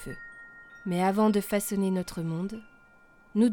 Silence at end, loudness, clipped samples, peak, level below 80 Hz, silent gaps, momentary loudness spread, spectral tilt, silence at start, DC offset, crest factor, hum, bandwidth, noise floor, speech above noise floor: 0 s; -28 LUFS; under 0.1%; -12 dBFS; -58 dBFS; none; 20 LU; -6 dB/octave; 0 s; under 0.1%; 16 dB; none; 19 kHz; -57 dBFS; 30 dB